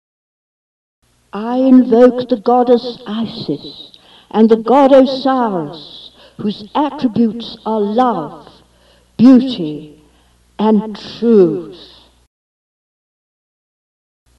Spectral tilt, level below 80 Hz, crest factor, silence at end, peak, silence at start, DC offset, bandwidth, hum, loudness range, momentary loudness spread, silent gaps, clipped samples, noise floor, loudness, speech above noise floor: -8 dB/octave; -54 dBFS; 14 dB; 2.6 s; 0 dBFS; 1.35 s; under 0.1%; 6.4 kHz; none; 5 LU; 20 LU; none; under 0.1%; -52 dBFS; -13 LUFS; 39 dB